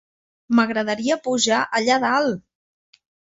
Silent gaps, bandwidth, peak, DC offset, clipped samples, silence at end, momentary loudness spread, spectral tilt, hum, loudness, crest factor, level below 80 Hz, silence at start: none; 8 kHz; -4 dBFS; under 0.1%; under 0.1%; 0.85 s; 4 LU; -3 dB/octave; none; -20 LUFS; 18 dB; -66 dBFS; 0.5 s